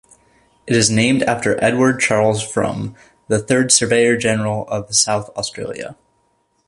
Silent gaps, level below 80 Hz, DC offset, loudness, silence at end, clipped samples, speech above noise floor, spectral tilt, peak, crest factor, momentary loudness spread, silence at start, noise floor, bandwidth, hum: none; -50 dBFS; under 0.1%; -16 LUFS; 0.75 s; under 0.1%; 46 dB; -3.5 dB/octave; 0 dBFS; 18 dB; 14 LU; 0.65 s; -63 dBFS; 11.5 kHz; none